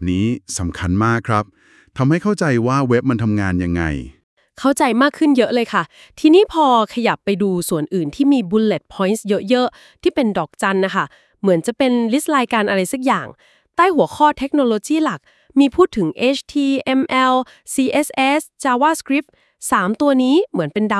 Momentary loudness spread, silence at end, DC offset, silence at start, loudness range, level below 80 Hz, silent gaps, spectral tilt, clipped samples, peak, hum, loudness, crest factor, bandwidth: 7 LU; 0 s; under 0.1%; 0 s; 2 LU; -48 dBFS; 4.23-4.37 s; -5.5 dB/octave; under 0.1%; 0 dBFS; none; -17 LUFS; 16 dB; 12 kHz